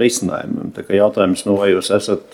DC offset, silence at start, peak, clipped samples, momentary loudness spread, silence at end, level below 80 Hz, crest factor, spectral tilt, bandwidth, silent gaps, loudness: under 0.1%; 0 s; 0 dBFS; under 0.1%; 9 LU; 0.1 s; -56 dBFS; 16 dB; -4.5 dB/octave; 16.5 kHz; none; -17 LUFS